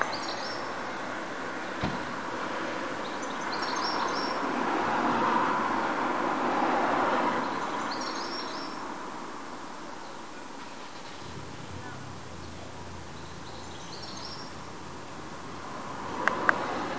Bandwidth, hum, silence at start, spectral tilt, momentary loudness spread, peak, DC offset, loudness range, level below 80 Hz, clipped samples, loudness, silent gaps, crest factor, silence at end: 8 kHz; none; 0 s; -4 dB/octave; 16 LU; -2 dBFS; 0.6%; 14 LU; -58 dBFS; under 0.1%; -32 LUFS; none; 30 dB; 0 s